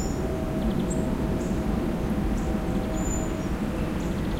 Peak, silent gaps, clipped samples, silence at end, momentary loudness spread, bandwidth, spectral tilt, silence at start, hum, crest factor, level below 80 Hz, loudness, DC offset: -14 dBFS; none; under 0.1%; 0 s; 2 LU; 16 kHz; -6.5 dB/octave; 0 s; none; 12 dB; -32 dBFS; -28 LUFS; under 0.1%